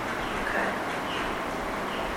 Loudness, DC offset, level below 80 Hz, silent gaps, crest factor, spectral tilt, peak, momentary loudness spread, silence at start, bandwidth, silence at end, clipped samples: -30 LUFS; under 0.1%; -46 dBFS; none; 16 dB; -4 dB/octave; -14 dBFS; 3 LU; 0 s; 17 kHz; 0 s; under 0.1%